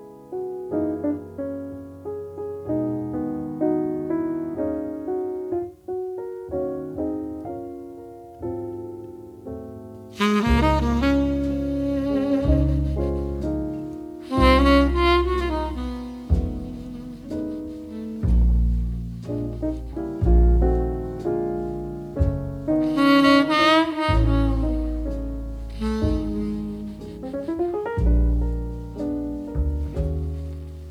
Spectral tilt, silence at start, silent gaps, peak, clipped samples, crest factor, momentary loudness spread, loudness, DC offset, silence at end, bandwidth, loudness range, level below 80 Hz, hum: -7.5 dB/octave; 0 s; none; -2 dBFS; under 0.1%; 20 dB; 16 LU; -24 LUFS; under 0.1%; 0 s; 11.5 kHz; 9 LU; -28 dBFS; none